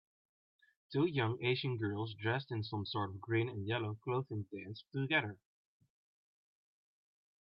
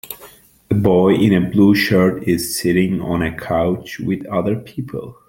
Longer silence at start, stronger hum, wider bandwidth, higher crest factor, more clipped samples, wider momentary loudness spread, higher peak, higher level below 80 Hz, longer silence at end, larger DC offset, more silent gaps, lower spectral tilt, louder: first, 0.9 s vs 0.05 s; neither; second, 5.6 kHz vs 17 kHz; about the same, 20 dB vs 16 dB; neither; second, 9 LU vs 13 LU; second, -18 dBFS vs 0 dBFS; second, -78 dBFS vs -46 dBFS; first, 2.05 s vs 0.15 s; neither; neither; second, -4.5 dB/octave vs -6 dB/octave; second, -38 LUFS vs -17 LUFS